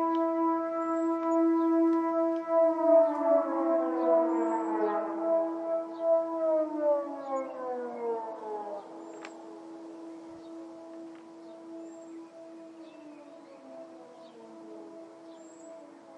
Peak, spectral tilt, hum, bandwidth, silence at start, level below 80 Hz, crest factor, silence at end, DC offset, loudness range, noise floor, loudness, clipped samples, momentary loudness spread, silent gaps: -14 dBFS; -6 dB/octave; none; 8.2 kHz; 0 s; under -90 dBFS; 18 dB; 0 s; under 0.1%; 22 LU; -50 dBFS; -29 LUFS; under 0.1%; 23 LU; none